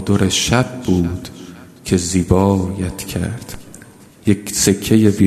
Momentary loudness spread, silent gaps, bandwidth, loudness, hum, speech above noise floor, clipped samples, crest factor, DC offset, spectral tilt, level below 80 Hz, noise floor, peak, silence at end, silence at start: 19 LU; none; 14 kHz; -17 LUFS; none; 26 dB; under 0.1%; 16 dB; under 0.1%; -5 dB/octave; -40 dBFS; -41 dBFS; 0 dBFS; 0 s; 0 s